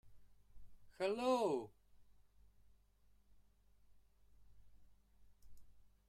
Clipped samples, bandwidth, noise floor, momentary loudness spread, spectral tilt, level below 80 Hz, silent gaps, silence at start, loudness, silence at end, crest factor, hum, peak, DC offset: under 0.1%; 14.5 kHz; -71 dBFS; 9 LU; -5 dB/octave; -70 dBFS; none; 0.05 s; -39 LUFS; 0.25 s; 22 dB; 50 Hz at -75 dBFS; -26 dBFS; under 0.1%